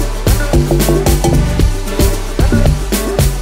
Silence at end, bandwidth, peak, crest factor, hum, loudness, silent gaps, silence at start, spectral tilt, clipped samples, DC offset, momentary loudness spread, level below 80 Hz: 0 s; 16.5 kHz; 0 dBFS; 12 dB; none; -14 LUFS; none; 0 s; -5.5 dB/octave; under 0.1%; under 0.1%; 4 LU; -14 dBFS